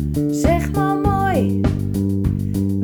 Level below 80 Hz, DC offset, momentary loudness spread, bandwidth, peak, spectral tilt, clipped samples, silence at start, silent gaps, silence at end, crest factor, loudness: -28 dBFS; under 0.1%; 3 LU; over 20 kHz; -2 dBFS; -7.5 dB/octave; under 0.1%; 0 s; none; 0 s; 16 dB; -19 LUFS